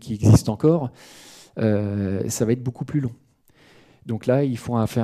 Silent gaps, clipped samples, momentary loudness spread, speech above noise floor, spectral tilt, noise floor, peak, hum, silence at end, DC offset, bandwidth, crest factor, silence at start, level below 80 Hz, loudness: none; under 0.1%; 15 LU; 35 dB; -7 dB/octave; -56 dBFS; -6 dBFS; none; 0 s; under 0.1%; 14.5 kHz; 16 dB; 0.05 s; -46 dBFS; -22 LUFS